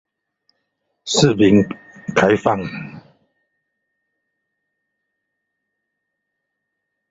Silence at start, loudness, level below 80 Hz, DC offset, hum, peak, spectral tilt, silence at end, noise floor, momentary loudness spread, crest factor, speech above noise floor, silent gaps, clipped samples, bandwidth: 1.05 s; -16 LUFS; -52 dBFS; under 0.1%; none; -2 dBFS; -5 dB/octave; 4.1 s; -77 dBFS; 19 LU; 20 dB; 62 dB; none; under 0.1%; 8 kHz